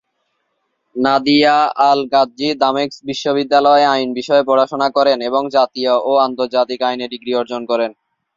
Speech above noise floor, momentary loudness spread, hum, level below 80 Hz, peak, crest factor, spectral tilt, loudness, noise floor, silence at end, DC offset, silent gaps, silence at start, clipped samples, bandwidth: 54 dB; 9 LU; none; -62 dBFS; 0 dBFS; 16 dB; -4.5 dB/octave; -15 LUFS; -69 dBFS; 0.45 s; under 0.1%; none; 0.95 s; under 0.1%; 7.6 kHz